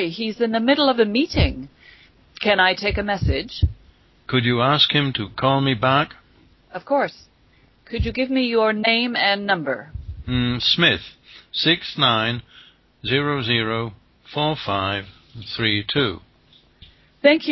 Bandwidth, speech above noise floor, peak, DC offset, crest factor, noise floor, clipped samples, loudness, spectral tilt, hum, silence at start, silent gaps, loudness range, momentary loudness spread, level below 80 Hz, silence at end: 6 kHz; 36 dB; -2 dBFS; under 0.1%; 20 dB; -56 dBFS; under 0.1%; -20 LUFS; -6.5 dB/octave; none; 0 s; none; 3 LU; 15 LU; -36 dBFS; 0 s